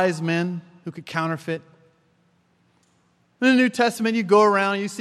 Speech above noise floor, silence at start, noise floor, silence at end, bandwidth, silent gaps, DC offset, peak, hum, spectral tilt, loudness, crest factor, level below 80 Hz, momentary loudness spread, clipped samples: 43 dB; 0 s; -63 dBFS; 0 s; 13.5 kHz; none; under 0.1%; -4 dBFS; none; -5.5 dB/octave; -21 LUFS; 18 dB; -76 dBFS; 16 LU; under 0.1%